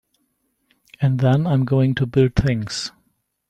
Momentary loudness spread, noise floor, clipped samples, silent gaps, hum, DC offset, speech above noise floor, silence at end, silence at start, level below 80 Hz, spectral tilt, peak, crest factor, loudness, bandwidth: 9 LU; -69 dBFS; under 0.1%; none; none; under 0.1%; 51 dB; 0.6 s; 1 s; -38 dBFS; -7 dB/octave; -4 dBFS; 16 dB; -19 LUFS; 9.2 kHz